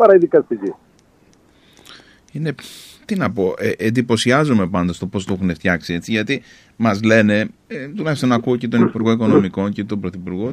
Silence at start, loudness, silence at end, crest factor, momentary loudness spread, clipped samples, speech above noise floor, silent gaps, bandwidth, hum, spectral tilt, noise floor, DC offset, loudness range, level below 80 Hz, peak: 0 s; -18 LUFS; 0 s; 18 dB; 12 LU; under 0.1%; 36 dB; none; 14 kHz; none; -6.5 dB/octave; -53 dBFS; under 0.1%; 7 LU; -52 dBFS; 0 dBFS